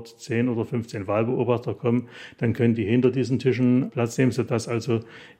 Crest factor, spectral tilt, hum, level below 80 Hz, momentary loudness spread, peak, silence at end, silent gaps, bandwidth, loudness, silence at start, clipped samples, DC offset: 16 dB; -7.5 dB/octave; none; -64 dBFS; 7 LU; -8 dBFS; 0.15 s; none; 12 kHz; -24 LUFS; 0 s; under 0.1%; under 0.1%